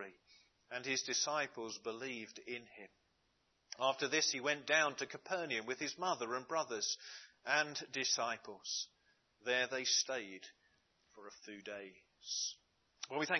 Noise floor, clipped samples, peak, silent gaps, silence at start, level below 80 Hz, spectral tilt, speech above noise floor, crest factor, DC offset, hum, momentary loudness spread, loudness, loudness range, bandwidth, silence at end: -79 dBFS; under 0.1%; -18 dBFS; none; 0 s; -90 dBFS; -1 dB/octave; 39 dB; 24 dB; under 0.1%; none; 19 LU; -38 LUFS; 5 LU; 6.6 kHz; 0 s